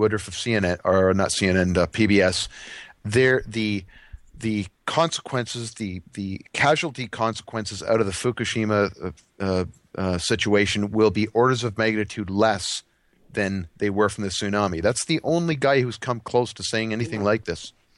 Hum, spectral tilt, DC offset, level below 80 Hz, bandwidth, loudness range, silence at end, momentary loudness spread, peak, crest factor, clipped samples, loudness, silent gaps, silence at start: none; -5 dB/octave; under 0.1%; -50 dBFS; 12 kHz; 4 LU; 0.25 s; 11 LU; -6 dBFS; 18 dB; under 0.1%; -23 LUFS; none; 0 s